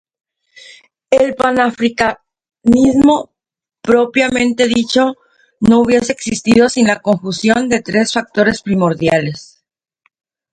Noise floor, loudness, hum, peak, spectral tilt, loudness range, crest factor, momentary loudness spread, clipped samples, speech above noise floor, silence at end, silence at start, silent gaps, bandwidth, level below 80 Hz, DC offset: -86 dBFS; -13 LUFS; none; 0 dBFS; -5 dB/octave; 2 LU; 14 dB; 8 LU; under 0.1%; 73 dB; 1.1 s; 1.1 s; none; 10.5 kHz; -44 dBFS; under 0.1%